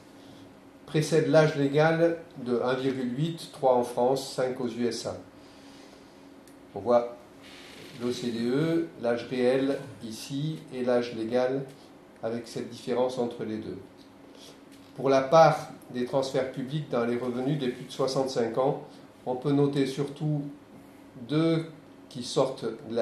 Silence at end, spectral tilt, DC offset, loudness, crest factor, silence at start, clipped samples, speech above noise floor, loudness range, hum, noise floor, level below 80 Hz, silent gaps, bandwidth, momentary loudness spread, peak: 0 s; -6 dB/octave; under 0.1%; -28 LUFS; 22 dB; 0.15 s; under 0.1%; 24 dB; 6 LU; none; -51 dBFS; -70 dBFS; none; 13.5 kHz; 18 LU; -6 dBFS